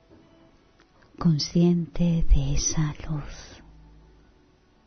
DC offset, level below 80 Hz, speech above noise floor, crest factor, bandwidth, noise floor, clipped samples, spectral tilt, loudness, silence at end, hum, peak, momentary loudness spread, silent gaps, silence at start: under 0.1%; -30 dBFS; 37 dB; 18 dB; 6.6 kHz; -59 dBFS; under 0.1%; -5.5 dB/octave; -25 LUFS; 1.3 s; none; -8 dBFS; 16 LU; none; 1.2 s